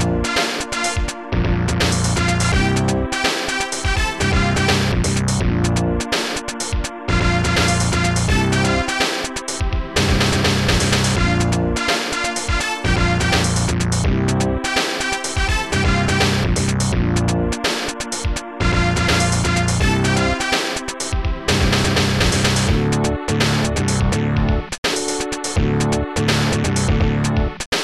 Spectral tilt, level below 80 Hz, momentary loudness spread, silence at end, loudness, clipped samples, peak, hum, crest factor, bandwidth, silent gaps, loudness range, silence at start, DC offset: -4.5 dB/octave; -26 dBFS; 5 LU; 0 s; -18 LUFS; under 0.1%; -4 dBFS; none; 14 dB; 14 kHz; 24.78-24.83 s, 27.66-27.72 s; 1 LU; 0 s; under 0.1%